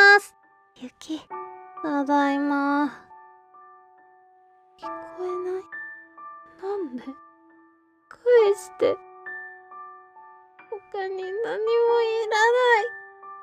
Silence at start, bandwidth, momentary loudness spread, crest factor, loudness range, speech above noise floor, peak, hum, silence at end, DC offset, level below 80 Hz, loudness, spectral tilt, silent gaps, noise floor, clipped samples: 0 s; 14 kHz; 24 LU; 20 dB; 11 LU; 36 dB; -6 dBFS; none; 0 s; under 0.1%; -76 dBFS; -23 LUFS; -2.5 dB/octave; none; -59 dBFS; under 0.1%